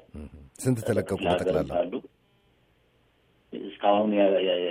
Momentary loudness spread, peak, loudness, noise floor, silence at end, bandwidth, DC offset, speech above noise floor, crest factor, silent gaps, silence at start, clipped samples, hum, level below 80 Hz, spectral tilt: 20 LU; -8 dBFS; -26 LUFS; -65 dBFS; 0 s; 15.5 kHz; under 0.1%; 41 dB; 20 dB; none; 0.15 s; under 0.1%; none; -54 dBFS; -6 dB/octave